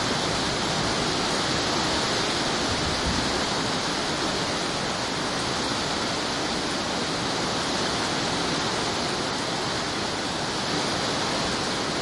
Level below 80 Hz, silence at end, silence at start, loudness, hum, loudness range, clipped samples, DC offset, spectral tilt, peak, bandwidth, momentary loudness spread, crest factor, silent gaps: -46 dBFS; 0 s; 0 s; -25 LUFS; none; 2 LU; under 0.1%; under 0.1%; -3 dB/octave; -12 dBFS; 11.5 kHz; 3 LU; 14 dB; none